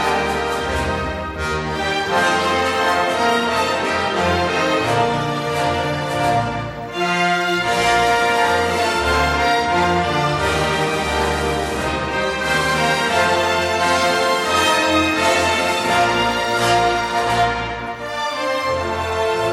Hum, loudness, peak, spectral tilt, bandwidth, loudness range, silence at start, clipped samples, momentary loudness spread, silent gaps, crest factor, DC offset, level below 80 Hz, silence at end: none; -18 LUFS; -4 dBFS; -4 dB/octave; 16 kHz; 3 LU; 0 s; under 0.1%; 6 LU; none; 14 dB; under 0.1%; -38 dBFS; 0 s